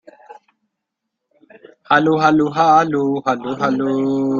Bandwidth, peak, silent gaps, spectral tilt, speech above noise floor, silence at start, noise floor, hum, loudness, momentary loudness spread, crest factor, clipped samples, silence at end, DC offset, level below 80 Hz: 7.2 kHz; -2 dBFS; none; -6.5 dB/octave; 63 dB; 0.3 s; -78 dBFS; none; -16 LUFS; 7 LU; 16 dB; under 0.1%; 0 s; under 0.1%; -62 dBFS